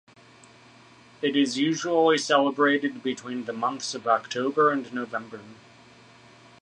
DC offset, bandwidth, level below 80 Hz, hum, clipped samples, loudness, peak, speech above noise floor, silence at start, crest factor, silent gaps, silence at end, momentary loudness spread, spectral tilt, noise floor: under 0.1%; 10.5 kHz; -76 dBFS; none; under 0.1%; -25 LUFS; -8 dBFS; 28 dB; 1.2 s; 20 dB; none; 1.05 s; 12 LU; -3.5 dB/octave; -53 dBFS